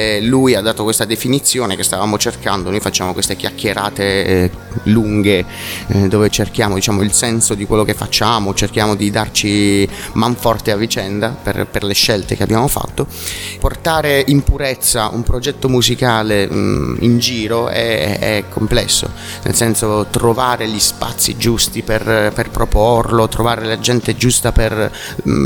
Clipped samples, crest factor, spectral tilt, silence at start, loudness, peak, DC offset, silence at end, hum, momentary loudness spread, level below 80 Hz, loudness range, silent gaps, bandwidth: under 0.1%; 14 dB; -4 dB/octave; 0 s; -15 LUFS; 0 dBFS; under 0.1%; 0 s; none; 6 LU; -28 dBFS; 2 LU; none; 19 kHz